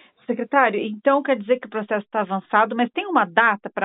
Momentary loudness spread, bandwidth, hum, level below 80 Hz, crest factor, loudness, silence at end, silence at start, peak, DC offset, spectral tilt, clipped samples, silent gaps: 7 LU; 4 kHz; none; -82 dBFS; 20 dB; -21 LUFS; 0 s; 0.3 s; -2 dBFS; under 0.1%; -9.5 dB/octave; under 0.1%; none